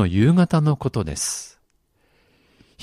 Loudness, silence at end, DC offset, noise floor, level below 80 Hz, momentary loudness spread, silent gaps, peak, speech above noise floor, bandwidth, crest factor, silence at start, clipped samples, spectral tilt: -20 LUFS; 1.35 s; under 0.1%; -65 dBFS; -44 dBFS; 12 LU; none; -4 dBFS; 46 dB; 14 kHz; 16 dB; 0 s; under 0.1%; -6 dB/octave